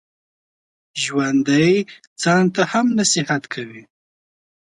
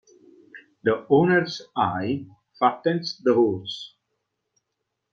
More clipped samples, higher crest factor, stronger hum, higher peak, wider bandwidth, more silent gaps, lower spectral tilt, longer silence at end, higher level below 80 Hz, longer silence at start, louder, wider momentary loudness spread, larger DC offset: neither; about the same, 18 dB vs 20 dB; neither; about the same, -4 dBFS vs -6 dBFS; first, 11.5 kHz vs 7.2 kHz; first, 2.07-2.16 s vs none; second, -4 dB/octave vs -6.5 dB/octave; second, 0.85 s vs 1.25 s; about the same, -64 dBFS vs -66 dBFS; first, 0.95 s vs 0.55 s; first, -18 LUFS vs -23 LUFS; about the same, 14 LU vs 12 LU; neither